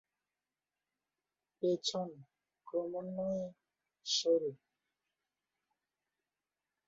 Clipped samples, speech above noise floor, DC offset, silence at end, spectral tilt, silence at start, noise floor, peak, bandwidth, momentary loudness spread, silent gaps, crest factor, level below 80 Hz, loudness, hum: under 0.1%; over 54 dB; under 0.1%; 2.3 s; -5 dB/octave; 1.6 s; under -90 dBFS; -20 dBFS; 7.4 kHz; 13 LU; none; 22 dB; -82 dBFS; -37 LUFS; none